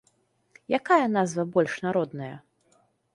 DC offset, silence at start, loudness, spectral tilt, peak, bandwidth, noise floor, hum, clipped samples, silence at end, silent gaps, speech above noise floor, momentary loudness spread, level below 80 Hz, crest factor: under 0.1%; 0.7 s; -25 LUFS; -6 dB/octave; -8 dBFS; 11.5 kHz; -68 dBFS; none; under 0.1%; 0.75 s; none; 43 dB; 16 LU; -72 dBFS; 18 dB